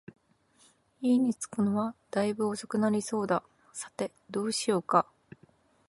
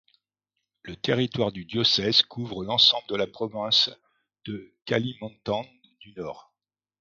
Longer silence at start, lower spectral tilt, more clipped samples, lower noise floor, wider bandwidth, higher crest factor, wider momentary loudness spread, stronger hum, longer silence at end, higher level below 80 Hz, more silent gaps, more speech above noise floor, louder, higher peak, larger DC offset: first, 1 s vs 0.85 s; about the same, -5 dB/octave vs -4.5 dB/octave; neither; second, -65 dBFS vs -87 dBFS; first, 11.5 kHz vs 7.6 kHz; about the same, 22 dB vs 24 dB; second, 11 LU vs 19 LU; second, none vs 50 Hz at -55 dBFS; first, 0.85 s vs 0.6 s; second, -74 dBFS vs -62 dBFS; neither; second, 36 dB vs 61 dB; second, -30 LUFS vs -24 LUFS; second, -8 dBFS vs -4 dBFS; neither